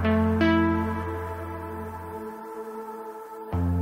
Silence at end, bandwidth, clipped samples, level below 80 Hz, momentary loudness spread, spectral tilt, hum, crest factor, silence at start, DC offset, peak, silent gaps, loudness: 0 s; 16 kHz; under 0.1%; -42 dBFS; 16 LU; -8 dB/octave; none; 16 dB; 0 s; under 0.1%; -10 dBFS; none; -28 LUFS